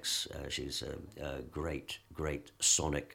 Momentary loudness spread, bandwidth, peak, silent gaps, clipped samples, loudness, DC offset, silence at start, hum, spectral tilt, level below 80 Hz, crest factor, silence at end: 15 LU; 17 kHz; -14 dBFS; none; under 0.1%; -35 LUFS; under 0.1%; 0 s; none; -2 dB/octave; -50 dBFS; 22 dB; 0 s